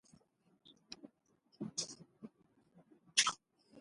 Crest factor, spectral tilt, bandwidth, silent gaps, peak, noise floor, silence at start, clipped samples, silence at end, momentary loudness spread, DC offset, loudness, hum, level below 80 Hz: 30 dB; 0 dB/octave; 11.5 kHz; none; -14 dBFS; -75 dBFS; 0.7 s; under 0.1%; 0 s; 25 LU; under 0.1%; -37 LUFS; none; -82 dBFS